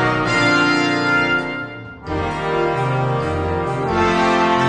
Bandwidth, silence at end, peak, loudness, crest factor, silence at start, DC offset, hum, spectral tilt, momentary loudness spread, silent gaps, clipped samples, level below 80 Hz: 10 kHz; 0 s; -2 dBFS; -18 LUFS; 16 dB; 0 s; under 0.1%; none; -5.5 dB/octave; 10 LU; none; under 0.1%; -40 dBFS